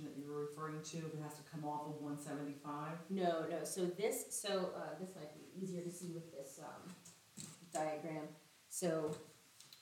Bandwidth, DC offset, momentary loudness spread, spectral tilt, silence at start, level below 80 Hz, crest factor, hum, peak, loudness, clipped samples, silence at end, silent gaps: 18 kHz; under 0.1%; 14 LU; -4.5 dB/octave; 0 s; under -90 dBFS; 20 dB; none; -26 dBFS; -44 LUFS; under 0.1%; 0 s; none